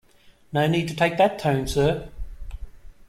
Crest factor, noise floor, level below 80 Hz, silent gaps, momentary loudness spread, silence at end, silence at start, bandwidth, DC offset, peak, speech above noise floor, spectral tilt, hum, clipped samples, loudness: 18 dB; -54 dBFS; -40 dBFS; none; 21 LU; 0.05 s; 0.5 s; 15.5 kHz; under 0.1%; -6 dBFS; 32 dB; -6 dB/octave; none; under 0.1%; -23 LUFS